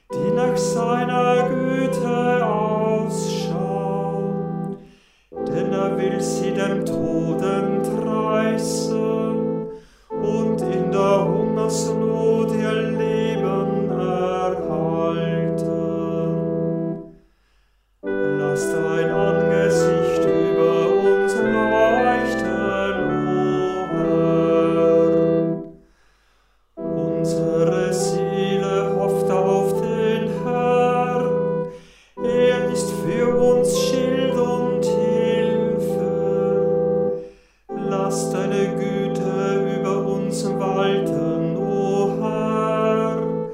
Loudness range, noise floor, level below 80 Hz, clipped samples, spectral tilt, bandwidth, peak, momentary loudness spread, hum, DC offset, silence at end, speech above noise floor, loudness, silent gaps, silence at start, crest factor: 5 LU; -60 dBFS; -52 dBFS; under 0.1%; -6 dB/octave; 15.5 kHz; -4 dBFS; 6 LU; none; under 0.1%; 0 s; 40 dB; -20 LUFS; none; 0.1 s; 16 dB